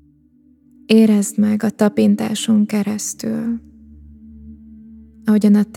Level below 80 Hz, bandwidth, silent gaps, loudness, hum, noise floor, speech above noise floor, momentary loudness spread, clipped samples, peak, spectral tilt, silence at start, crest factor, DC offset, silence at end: -50 dBFS; 15.5 kHz; none; -17 LUFS; none; -53 dBFS; 38 dB; 10 LU; under 0.1%; 0 dBFS; -5.5 dB/octave; 0.9 s; 18 dB; under 0.1%; 0 s